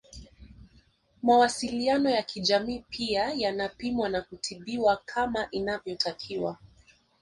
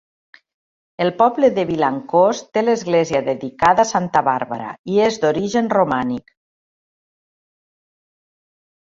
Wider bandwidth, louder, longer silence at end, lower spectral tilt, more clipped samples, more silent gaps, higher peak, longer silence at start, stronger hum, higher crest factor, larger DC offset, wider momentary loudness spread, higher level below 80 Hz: first, 11.5 kHz vs 7.8 kHz; second, -28 LUFS vs -18 LUFS; second, 0.65 s vs 2.6 s; second, -3.5 dB/octave vs -5.5 dB/octave; neither; second, none vs 4.79-4.84 s; second, -10 dBFS vs -2 dBFS; second, 0.15 s vs 1 s; neither; about the same, 18 dB vs 18 dB; neither; first, 11 LU vs 8 LU; about the same, -56 dBFS vs -56 dBFS